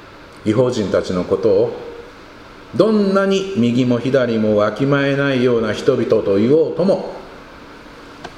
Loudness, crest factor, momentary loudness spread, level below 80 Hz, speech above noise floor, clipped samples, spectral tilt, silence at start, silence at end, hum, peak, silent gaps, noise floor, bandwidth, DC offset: -16 LUFS; 16 dB; 12 LU; -48 dBFS; 23 dB; under 0.1%; -7 dB/octave; 0 s; 0 s; none; 0 dBFS; none; -39 dBFS; 10.5 kHz; under 0.1%